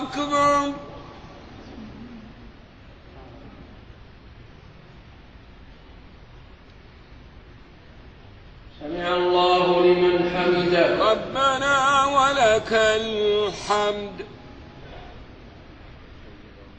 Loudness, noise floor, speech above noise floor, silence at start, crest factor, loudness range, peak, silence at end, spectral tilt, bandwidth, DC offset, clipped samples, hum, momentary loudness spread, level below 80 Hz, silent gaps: -20 LUFS; -47 dBFS; 24 dB; 0 s; 20 dB; 21 LU; -6 dBFS; 0.1 s; -4.5 dB/octave; 8.8 kHz; under 0.1%; under 0.1%; none; 25 LU; -48 dBFS; none